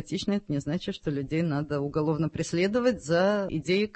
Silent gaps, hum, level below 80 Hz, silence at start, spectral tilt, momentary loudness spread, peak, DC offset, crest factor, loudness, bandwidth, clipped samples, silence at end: none; none; -54 dBFS; 0 s; -6 dB/octave; 6 LU; -12 dBFS; under 0.1%; 16 dB; -28 LUFS; 8.8 kHz; under 0.1%; 0.05 s